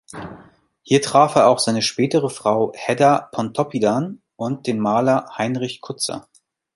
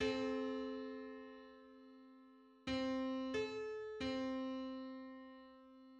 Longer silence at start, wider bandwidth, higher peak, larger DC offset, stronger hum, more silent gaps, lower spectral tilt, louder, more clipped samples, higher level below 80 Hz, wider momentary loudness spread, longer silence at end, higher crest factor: first, 0.15 s vs 0 s; first, 11.5 kHz vs 9 kHz; first, 0 dBFS vs -28 dBFS; neither; neither; neither; about the same, -5 dB/octave vs -5 dB/octave; first, -19 LUFS vs -44 LUFS; neither; first, -60 dBFS vs -70 dBFS; second, 13 LU vs 20 LU; first, 0.55 s vs 0 s; about the same, 20 dB vs 16 dB